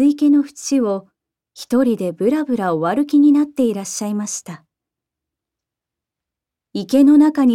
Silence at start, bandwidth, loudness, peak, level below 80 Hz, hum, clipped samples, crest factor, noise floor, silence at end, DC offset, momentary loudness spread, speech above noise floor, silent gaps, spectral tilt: 0 s; 13.5 kHz; -16 LUFS; -4 dBFS; -64 dBFS; none; under 0.1%; 14 dB; -85 dBFS; 0 s; under 0.1%; 15 LU; 70 dB; none; -5.5 dB/octave